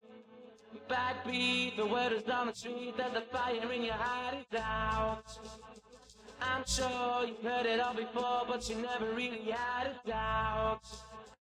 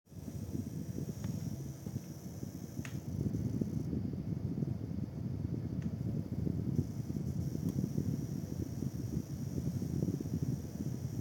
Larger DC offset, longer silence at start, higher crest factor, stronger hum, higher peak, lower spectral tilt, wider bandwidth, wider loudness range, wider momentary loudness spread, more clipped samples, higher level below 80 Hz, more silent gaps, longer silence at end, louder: neither; about the same, 0.05 s vs 0.1 s; about the same, 16 dB vs 18 dB; neither; about the same, -20 dBFS vs -20 dBFS; second, -3.5 dB/octave vs -8 dB/octave; second, 14 kHz vs 17 kHz; about the same, 3 LU vs 3 LU; first, 17 LU vs 7 LU; neither; about the same, -52 dBFS vs -56 dBFS; neither; about the same, 0.05 s vs 0 s; first, -35 LUFS vs -39 LUFS